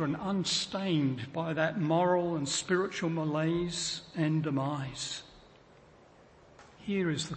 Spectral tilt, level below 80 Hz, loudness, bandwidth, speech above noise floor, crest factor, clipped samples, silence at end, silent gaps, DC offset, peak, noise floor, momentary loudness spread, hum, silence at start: -5 dB/octave; -64 dBFS; -31 LUFS; 8.8 kHz; 27 dB; 18 dB; under 0.1%; 0 s; none; under 0.1%; -14 dBFS; -58 dBFS; 7 LU; none; 0 s